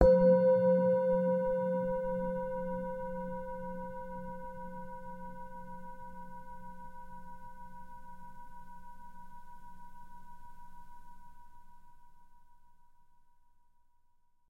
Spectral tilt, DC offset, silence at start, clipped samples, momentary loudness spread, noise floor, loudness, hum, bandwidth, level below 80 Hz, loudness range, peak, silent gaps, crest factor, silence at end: -9.5 dB/octave; under 0.1%; 0 s; under 0.1%; 27 LU; -66 dBFS; -32 LUFS; none; 4.6 kHz; -50 dBFS; 25 LU; -8 dBFS; none; 26 dB; 1.45 s